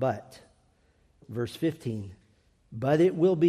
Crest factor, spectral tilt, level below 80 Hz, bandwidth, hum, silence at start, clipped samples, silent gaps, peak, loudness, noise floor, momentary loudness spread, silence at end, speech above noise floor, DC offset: 16 dB; -8 dB/octave; -66 dBFS; 14 kHz; none; 0 s; under 0.1%; none; -12 dBFS; -29 LUFS; -65 dBFS; 17 LU; 0 s; 39 dB; under 0.1%